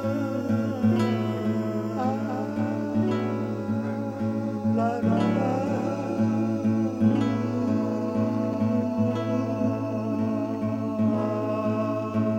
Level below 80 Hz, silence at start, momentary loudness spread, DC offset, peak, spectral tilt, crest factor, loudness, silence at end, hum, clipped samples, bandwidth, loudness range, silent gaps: -64 dBFS; 0 s; 5 LU; under 0.1%; -10 dBFS; -8.5 dB/octave; 14 dB; -26 LUFS; 0 s; none; under 0.1%; 8.4 kHz; 2 LU; none